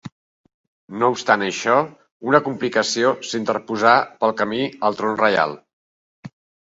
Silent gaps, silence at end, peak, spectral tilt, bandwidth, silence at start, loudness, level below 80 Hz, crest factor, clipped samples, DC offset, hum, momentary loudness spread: 0.12-0.44 s, 0.54-0.88 s, 2.12-2.20 s, 5.73-6.23 s; 0.4 s; 0 dBFS; -4 dB/octave; 8 kHz; 0.05 s; -19 LUFS; -66 dBFS; 20 dB; under 0.1%; under 0.1%; none; 8 LU